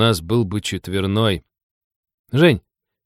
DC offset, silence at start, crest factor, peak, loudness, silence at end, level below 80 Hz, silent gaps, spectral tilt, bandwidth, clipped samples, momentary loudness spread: under 0.1%; 0 s; 18 dB; -2 dBFS; -19 LUFS; 0.45 s; -46 dBFS; 1.63-1.90 s, 1.96-2.03 s, 2.14-2.24 s; -6 dB/octave; 15 kHz; under 0.1%; 9 LU